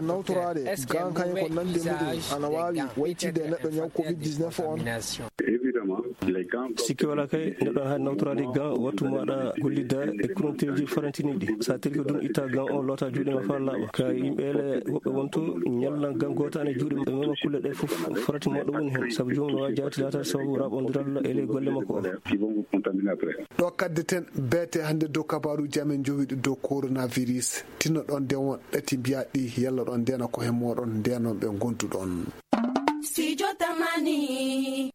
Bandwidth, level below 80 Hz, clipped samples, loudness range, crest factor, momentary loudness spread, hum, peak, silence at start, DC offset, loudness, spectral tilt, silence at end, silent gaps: 16.5 kHz; -62 dBFS; under 0.1%; 1 LU; 24 dB; 3 LU; none; -4 dBFS; 0 s; under 0.1%; -28 LUFS; -5.5 dB/octave; 0.05 s; none